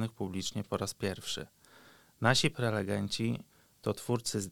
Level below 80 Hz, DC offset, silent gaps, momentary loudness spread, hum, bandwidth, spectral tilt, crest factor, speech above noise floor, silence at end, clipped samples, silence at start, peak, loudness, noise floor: -64 dBFS; under 0.1%; none; 11 LU; none; 18.5 kHz; -4.5 dB/octave; 24 dB; 27 dB; 0 s; under 0.1%; 0 s; -10 dBFS; -33 LUFS; -60 dBFS